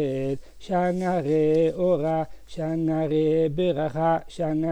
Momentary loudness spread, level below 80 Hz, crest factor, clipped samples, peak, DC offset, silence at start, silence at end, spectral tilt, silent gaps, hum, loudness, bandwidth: 8 LU; -50 dBFS; 12 dB; under 0.1%; -12 dBFS; under 0.1%; 0 s; 0 s; -8 dB/octave; none; none; -24 LUFS; 10 kHz